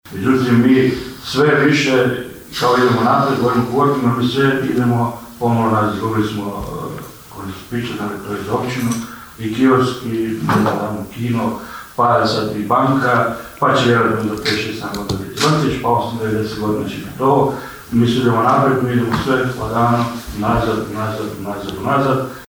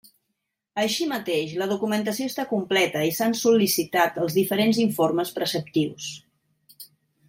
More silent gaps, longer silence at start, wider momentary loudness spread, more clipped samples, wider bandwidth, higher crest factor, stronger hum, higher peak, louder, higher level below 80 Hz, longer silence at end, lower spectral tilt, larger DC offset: neither; second, 0.05 s vs 0.75 s; first, 12 LU vs 7 LU; neither; first, over 20 kHz vs 16.5 kHz; about the same, 14 dB vs 18 dB; neither; first, -2 dBFS vs -8 dBFS; first, -17 LUFS vs -23 LUFS; first, -42 dBFS vs -68 dBFS; second, 0.05 s vs 0.45 s; first, -6 dB/octave vs -4 dB/octave; neither